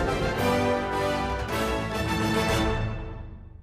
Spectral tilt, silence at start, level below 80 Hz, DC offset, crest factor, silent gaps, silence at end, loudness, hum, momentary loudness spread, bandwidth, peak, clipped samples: -5.5 dB/octave; 0 s; -36 dBFS; under 0.1%; 14 dB; none; 0 s; -26 LUFS; none; 12 LU; 15.5 kHz; -14 dBFS; under 0.1%